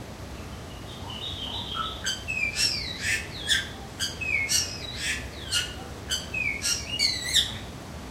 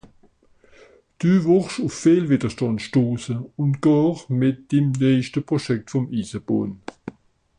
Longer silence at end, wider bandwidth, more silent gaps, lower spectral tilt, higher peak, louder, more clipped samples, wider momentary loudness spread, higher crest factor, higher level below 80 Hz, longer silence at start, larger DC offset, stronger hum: second, 0 s vs 0.5 s; first, 16 kHz vs 10.5 kHz; neither; second, -1 dB/octave vs -7.5 dB/octave; about the same, -8 dBFS vs -6 dBFS; second, -27 LUFS vs -21 LUFS; neither; first, 16 LU vs 10 LU; first, 22 dB vs 16 dB; first, -44 dBFS vs -56 dBFS; second, 0 s vs 1.2 s; neither; neither